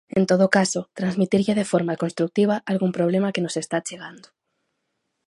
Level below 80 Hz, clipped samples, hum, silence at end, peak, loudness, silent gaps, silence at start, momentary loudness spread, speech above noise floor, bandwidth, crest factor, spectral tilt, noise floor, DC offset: -64 dBFS; under 0.1%; none; 1.1 s; -2 dBFS; -22 LUFS; none; 0.15 s; 9 LU; 55 dB; 11.5 kHz; 20 dB; -5.5 dB/octave; -76 dBFS; under 0.1%